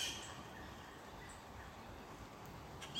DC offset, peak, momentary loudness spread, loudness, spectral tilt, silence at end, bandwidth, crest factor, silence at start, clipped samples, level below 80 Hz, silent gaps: under 0.1%; -30 dBFS; 5 LU; -51 LUFS; -2.5 dB/octave; 0 s; 16.5 kHz; 20 dB; 0 s; under 0.1%; -62 dBFS; none